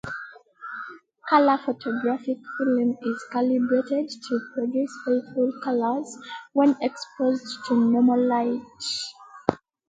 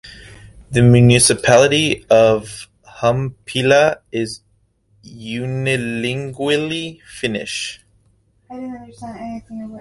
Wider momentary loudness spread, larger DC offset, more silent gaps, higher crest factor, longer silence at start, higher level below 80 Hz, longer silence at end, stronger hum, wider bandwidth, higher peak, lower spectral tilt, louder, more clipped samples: second, 16 LU vs 21 LU; neither; neither; first, 24 dB vs 18 dB; about the same, 0.05 s vs 0.05 s; second, -68 dBFS vs -46 dBFS; first, 0.35 s vs 0 s; neither; second, 9.2 kHz vs 11.5 kHz; about the same, 0 dBFS vs 0 dBFS; about the same, -5 dB/octave vs -4.5 dB/octave; second, -24 LUFS vs -16 LUFS; neither